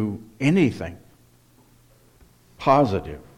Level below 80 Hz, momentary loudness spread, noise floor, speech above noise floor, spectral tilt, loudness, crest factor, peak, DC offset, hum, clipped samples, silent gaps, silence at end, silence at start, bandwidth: -52 dBFS; 13 LU; -56 dBFS; 34 dB; -7.5 dB/octave; -21 LUFS; 20 dB; -4 dBFS; under 0.1%; none; under 0.1%; none; 0.15 s; 0 s; 15.5 kHz